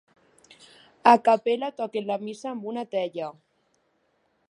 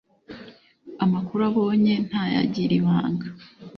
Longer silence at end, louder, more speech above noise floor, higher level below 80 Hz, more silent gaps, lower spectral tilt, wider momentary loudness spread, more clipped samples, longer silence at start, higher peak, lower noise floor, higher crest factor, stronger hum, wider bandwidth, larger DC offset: first, 1.2 s vs 0 s; about the same, -25 LUFS vs -23 LUFS; first, 46 dB vs 25 dB; second, -82 dBFS vs -60 dBFS; neither; second, -5 dB/octave vs -8.5 dB/octave; second, 15 LU vs 22 LU; neither; first, 1.05 s vs 0.3 s; first, -2 dBFS vs -8 dBFS; first, -70 dBFS vs -47 dBFS; first, 26 dB vs 16 dB; neither; first, 11 kHz vs 6.4 kHz; neither